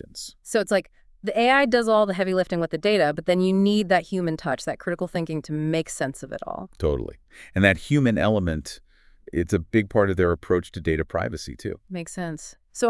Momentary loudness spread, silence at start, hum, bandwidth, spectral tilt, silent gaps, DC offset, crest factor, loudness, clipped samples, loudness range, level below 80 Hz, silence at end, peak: 14 LU; 0.15 s; none; 12 kHz; -6 dB/octave; none; under 0.1%; 22 dB; -24 LUFS; under 0.1%; 5 LU; -46 dBFS; 0 s; -2 dBFS